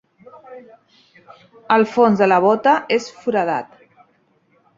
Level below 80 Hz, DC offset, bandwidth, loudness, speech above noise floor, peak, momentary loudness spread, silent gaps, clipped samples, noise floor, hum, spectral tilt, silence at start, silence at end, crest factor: -66 dBFS; under 0.1%; 7.8 kHz; -17 LUFS; 42 dB; -2 dBFS; 8 LU; none; under 0.1%; -60 dBFS; none; -6 dB/octave; 0.5 s; 1.15 s; 18 dB